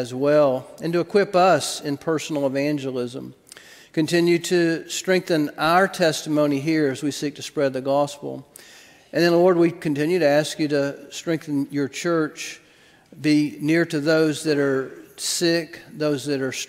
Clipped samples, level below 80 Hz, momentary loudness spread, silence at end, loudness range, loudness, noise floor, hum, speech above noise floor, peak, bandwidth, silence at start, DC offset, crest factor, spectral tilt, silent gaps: under 0.1%; -66 dBFS; 11 LU; 0.05 s; 3 LU; -22 LUFS; -54 dBFS; none; 32 dB; -4 dBFS; 16 kHz; 0 s; under 0.1%; 18 dB; -5 dB/octave; none